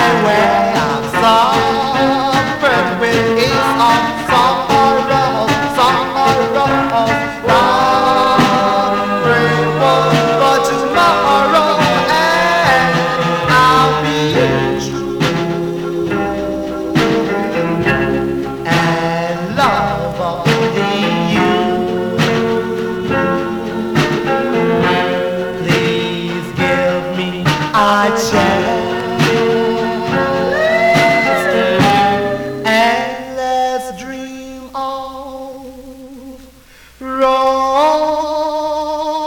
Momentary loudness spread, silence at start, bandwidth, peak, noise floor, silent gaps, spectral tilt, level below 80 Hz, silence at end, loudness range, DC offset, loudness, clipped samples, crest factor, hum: 8 LU; 0 s; 19 kHz; -2 dBFS; -42 dBFS; none; -5 dB/octave; -40 dBFS; 0 s; 5 LU; 0.2%; -13 LUFS; under 0.1%; 12 dB; none